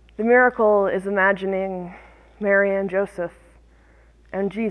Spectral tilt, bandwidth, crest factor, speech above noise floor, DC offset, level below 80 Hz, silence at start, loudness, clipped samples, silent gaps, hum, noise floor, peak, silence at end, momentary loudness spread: -7.5 dB/octave; 11 kHz; 18 dB; 32 dB; under 0.1%; -52 dBFS; 0.2 s; -20 LUFS; under 0.1%; none; none; -53 dBFS; -4 dBFS; 0 s; 16 LU